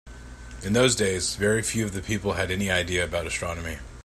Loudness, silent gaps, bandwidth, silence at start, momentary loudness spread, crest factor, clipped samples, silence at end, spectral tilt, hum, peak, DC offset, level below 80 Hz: -25 LUFS; none; 16 kHz; 0.05 s; 15 LU; 20 dB; under 0.1%; 0.05 s; -3.5 dB/octave; none; -6 dBFS; under 0.1%; -44 dBFS